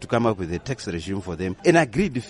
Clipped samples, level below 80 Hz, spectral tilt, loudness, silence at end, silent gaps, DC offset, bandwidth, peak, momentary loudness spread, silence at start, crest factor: under 0.1%; -46 dBFS; -6 dB/octave; -23 LUFS; 0 s; none; under 0.1%; 11.5 kHz; -4 dBFS; 11 LU; 0 s; 18 dB